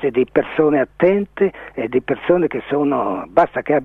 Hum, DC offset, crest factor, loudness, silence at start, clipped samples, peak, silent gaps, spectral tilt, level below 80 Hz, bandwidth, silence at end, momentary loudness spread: none; under 0.1%; 16 dB; -18 LUFS; 0 s; under 0.1%; 0 dBFS; none; -9 dB/octave; -52 dBFS; 4.3 kHz; 0 s; 4 LU